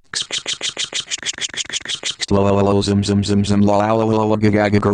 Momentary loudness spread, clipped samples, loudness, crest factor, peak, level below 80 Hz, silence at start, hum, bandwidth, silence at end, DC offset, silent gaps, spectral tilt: 7 LU; under 0.1%; -17 LUFS; 14 dB; -4 dBFS; -44 dBFS; 0.15 s; none; 10.5 kHz; 0 s; under 0.1%; none; -4.5 dB/octave